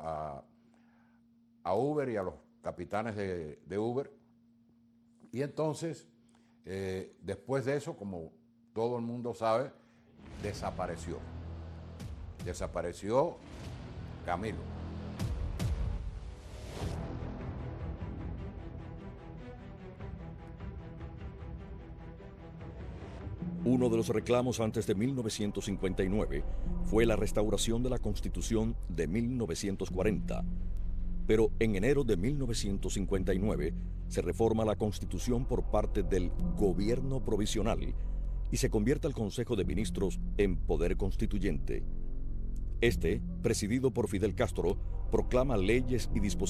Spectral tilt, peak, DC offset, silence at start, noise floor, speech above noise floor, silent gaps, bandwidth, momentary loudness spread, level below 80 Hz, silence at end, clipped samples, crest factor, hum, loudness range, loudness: -6 dB/octave; -14 dBFS; under 0.1%; 0 s; -65 dBFS; 33 dB; none; 14.5 kHz; 16 LU; -38 dBFS; 0 s; under 0.1%; 20 dB; none; 10 LU; -34 LUFS